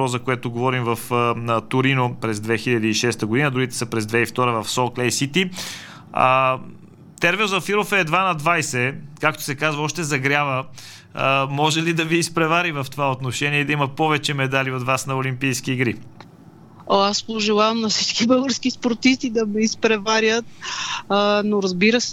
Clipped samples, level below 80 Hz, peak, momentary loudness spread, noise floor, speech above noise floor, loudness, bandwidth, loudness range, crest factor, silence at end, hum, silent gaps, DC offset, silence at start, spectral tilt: under 0.1%; -56 dBFS; -2 dBFS; 6 LU; -45 dBFS; 25 dB; -20 LUFS; 17.5 kHz; 2 LU; 20 dB; 0 s; none; none; under 0.1%; 0 s; -4 dB/octave